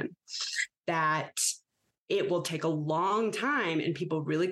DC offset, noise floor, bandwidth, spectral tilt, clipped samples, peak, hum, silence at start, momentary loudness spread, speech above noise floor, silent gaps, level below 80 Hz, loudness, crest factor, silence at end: under 0.1%; -77 dBFS; 13 kHz; -3.5 dB/octave; under 0.1%; -16 dBFS; none; 0 s; 5 LU; 47 dB; 1.98-2.06 s; -80 dBFS; -30 LUFS; 16 dB; 0 s